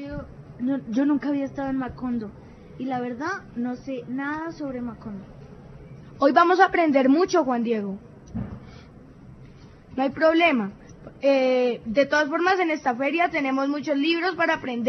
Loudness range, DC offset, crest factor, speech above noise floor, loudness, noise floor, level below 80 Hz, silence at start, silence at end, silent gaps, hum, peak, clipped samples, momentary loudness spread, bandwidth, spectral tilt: 9 LU; under 0.1%; 20 dB; 24 dB; -23 LUFS; -46 dBFS; -54 dBFS; 0 s; 0 s; none; none; -4 dBFS; under 0.1%; 19 LU; 6.4 kHz; -5.5 dB/octave